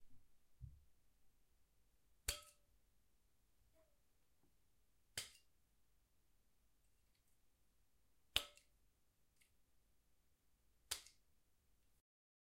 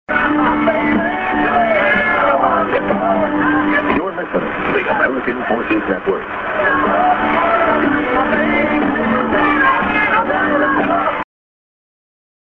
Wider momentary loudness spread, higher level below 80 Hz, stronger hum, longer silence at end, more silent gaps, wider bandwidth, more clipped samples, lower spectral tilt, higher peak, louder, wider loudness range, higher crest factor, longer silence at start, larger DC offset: first, 20 LU vs 6 LU; second, -70 dBFS vs -42 dBFS; neither; about the same, 1.3 s vs 1.3 s; neither; first, 16 kHz vs 5.8 kHz; neither; second, -0.5 dB/octave vs -8 dB/octave; second, -16 dBFS vs -2 dBFS; second, -48 LUFS vs -15 LUFS; first, 8 LU vs 2 LU; first, 42 dB vs 14 dB; about the same, 0 s vs 0.1 s; neither